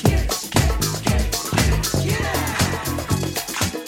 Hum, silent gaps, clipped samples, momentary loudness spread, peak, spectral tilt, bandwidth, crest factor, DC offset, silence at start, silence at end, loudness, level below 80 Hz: none; none; under 0.1%; 4 LU; -2 dBFS; -4 dB/octave; 17.5 kHz; 20 dB; under 0.1%; 0 s; 0 s; -21 LUFS; -26 dBFS